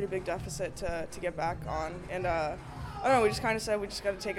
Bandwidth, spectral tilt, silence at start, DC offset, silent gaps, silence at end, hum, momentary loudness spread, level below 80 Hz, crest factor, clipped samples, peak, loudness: 16.5 kHz; -4.5 dB/octave; 0 s; under 0.1%; none; 0 s; none; 11 LU; -48 dBFS; 18 dB; under 0.1%; -14 dBFS; -32 LUFS